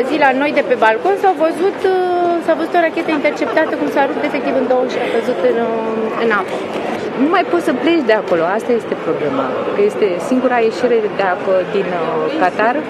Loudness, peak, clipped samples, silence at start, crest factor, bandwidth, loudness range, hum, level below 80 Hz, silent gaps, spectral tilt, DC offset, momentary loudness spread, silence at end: -15 LUFS; 0 dBFS; under 0.1%; 0 s; 16 dB; 13.5 kHz; 2 LU; none; -60 dBFS; none; -5.5 dB/octave; under 0.1%; 5 LU; 0 s